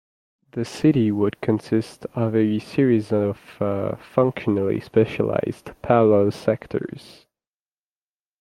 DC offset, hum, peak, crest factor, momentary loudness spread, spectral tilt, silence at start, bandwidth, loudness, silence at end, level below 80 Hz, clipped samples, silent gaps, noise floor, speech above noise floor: under 0.1%; none; -2 dBFS; 20 dB; 12 LU; -8 dB/octave; 0.55 s; 13 kHz; -22 LUFS; 1.4 s; -58 dBFS; under 0.1%; none; under -90 dBFS; over 69 dB